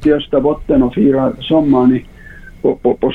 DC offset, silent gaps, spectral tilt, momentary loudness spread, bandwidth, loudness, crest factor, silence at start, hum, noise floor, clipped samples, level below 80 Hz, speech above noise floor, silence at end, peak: under 0.1%; none; -9 dB/octave; 6 LU; 4.3 kHz; -14 LUFS; 12 dB; 0 s; none; -35 dBFS; under 0.1%; -34 dBFS; 23 dB; 0 s; -2 dBFS